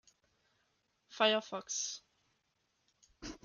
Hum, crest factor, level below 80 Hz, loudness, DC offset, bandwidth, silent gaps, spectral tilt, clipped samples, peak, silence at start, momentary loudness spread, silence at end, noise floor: none; 24 dB; -70 dBFS; -34 LUFS; under 0.1%; 10 kHz; none; -1 dB/octave; under 0.1%; -16 dBFS; 1.1 s; 20 LU; 0.1 s; -80 dBFS